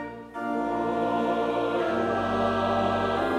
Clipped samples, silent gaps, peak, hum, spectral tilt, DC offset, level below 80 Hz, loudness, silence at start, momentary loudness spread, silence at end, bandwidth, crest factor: under 0.1%; none; -12 dBFS; none; -6.5 dB/octave; under 0.1%; -52 dBFS; -26 LUFS; 0 s; 5 LU; 0 s; 13 kHz; 14 dB